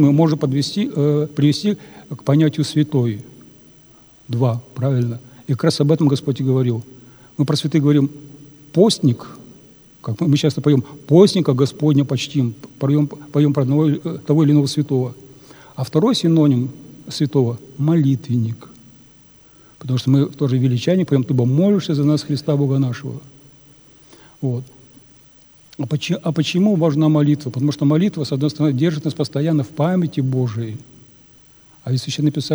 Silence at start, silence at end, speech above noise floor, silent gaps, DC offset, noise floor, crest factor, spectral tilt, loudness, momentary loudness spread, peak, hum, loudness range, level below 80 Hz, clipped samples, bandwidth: 0 s; 0 s; 32 dB; none; under 0.1%; -49 dBFS; 18 dB; -7.5 dB/octave; -18 LUFS; 12 LU; 0 dBFS; none; 5 LU; -62 dBFS; under 0.1%; over 20 kHz